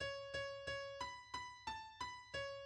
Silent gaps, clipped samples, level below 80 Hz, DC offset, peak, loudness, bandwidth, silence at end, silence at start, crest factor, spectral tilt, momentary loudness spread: none; under 0.1%; -68 dBFS; under 0.1%; -32 dBFS; -48 LUFS; 11.5 kHz; 0 s; 0 s; 16 dB; -2.5 dB/octave; 4 LU